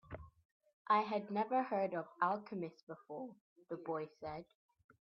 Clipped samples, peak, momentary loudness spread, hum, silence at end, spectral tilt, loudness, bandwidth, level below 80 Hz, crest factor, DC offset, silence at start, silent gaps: under 0.1%; -20 dBFS; 17 LU; none; 0.6 s; -4.5 dB/octave; -40 LUFS; 6.2 kHz; -72 dBFS; 20 dB; under 0.1%; 0.1 s; 0.45-0.60 s, 0.73-0.85 s, 2.83-2.87 s, 3.41-3.56 s